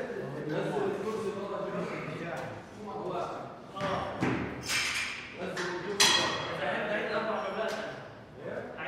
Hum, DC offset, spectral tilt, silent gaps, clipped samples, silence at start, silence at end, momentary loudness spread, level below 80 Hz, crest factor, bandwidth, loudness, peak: none; under 0.1%; -3 dB/octave; none; under 0.1%; 0 s; 0 s; 14 LU; -62 dBFS; 24 dB; 16 kHz; -32 LUFS; -10 dBFS